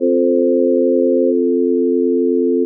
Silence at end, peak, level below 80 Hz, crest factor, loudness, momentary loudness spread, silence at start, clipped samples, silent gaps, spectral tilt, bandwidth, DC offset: 0 s; -4 dBFS; under -90 dBFS; 10 dB; -15 LUFS; 1 LU; 0 s; under 0.1%; none; -16 dB/octave; 0.6 kHz; under 0.1%